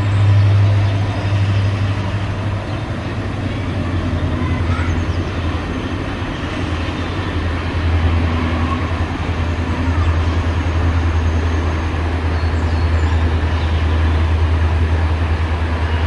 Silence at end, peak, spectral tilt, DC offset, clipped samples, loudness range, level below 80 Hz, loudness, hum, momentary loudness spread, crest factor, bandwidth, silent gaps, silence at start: 0 s; -4 dBFS; -7 dB/octave; under 0.1%; under 0.1%; 3 LU; -26 dBFS; -18 LUFS; none; 6 LU; 12 dB; 8 kHz; none; 0 s